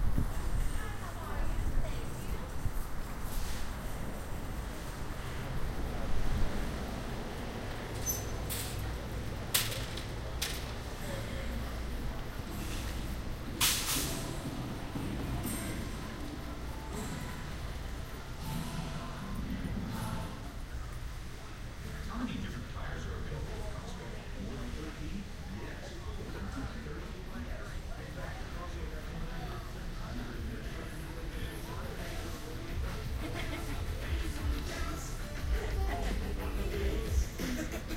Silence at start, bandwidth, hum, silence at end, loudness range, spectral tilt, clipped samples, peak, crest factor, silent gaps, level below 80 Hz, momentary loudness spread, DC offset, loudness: 0 s; 16 kHz; none; 0 s; 8 LU; -4 dB/octave; under 0.1%; -10 dBFS; 26 dB; none; -40 dBFS; 8 LU; under 0.1%; -39 LUFS